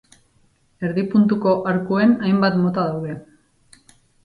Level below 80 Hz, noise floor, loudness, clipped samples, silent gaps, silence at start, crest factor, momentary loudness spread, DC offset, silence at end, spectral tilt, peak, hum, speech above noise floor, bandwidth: -58 dBFS; -60 dBFS; -19 LUFS; under 0.1%; none; 0.8 s; 16 dB; 12 LU; under 0.1%; 1.05 s; -8.5 dB/octave; -6 dBFS; none; 42 dB; 10.5 kHz